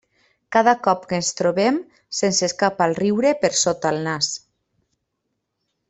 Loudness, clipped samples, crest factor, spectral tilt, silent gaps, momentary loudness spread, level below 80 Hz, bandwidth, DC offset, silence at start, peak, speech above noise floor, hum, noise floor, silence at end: -20 LUFS; under 0.1%; 18 dB; -3.5 dB/octave; none; 6 LU; -62 dBFS; 8.4 kHz; under 0.1%; 0.5 s; -2 dBFS; 57 dB; none; -76 dBFS; 1.5 s